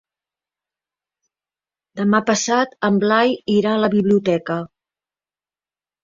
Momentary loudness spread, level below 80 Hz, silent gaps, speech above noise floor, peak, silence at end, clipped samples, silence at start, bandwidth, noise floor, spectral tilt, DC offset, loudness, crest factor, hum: 10 LU; -62 dBFS; none; over 73 dB; -2 dBFS; 1.4 s; under 0.1%; 1.95 s; 7.6 kHz; under -90 dBFS; -5 dB/octave; under 0.1%; -18 LUFS; 18 dB; 50 Hz at -35 dBFS